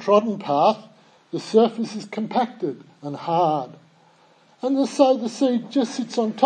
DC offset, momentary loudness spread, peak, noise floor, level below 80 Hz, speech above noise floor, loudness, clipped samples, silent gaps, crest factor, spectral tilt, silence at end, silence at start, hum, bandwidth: under 0.1%; 14 LU; -2 dBFS; -56 dBFS; -78 dBFS; 35 dB; -22 LUFS; under 0.1%; none; 20 dB; -6 dB/octave; 0 s; 0 s; none; 9.8 kHz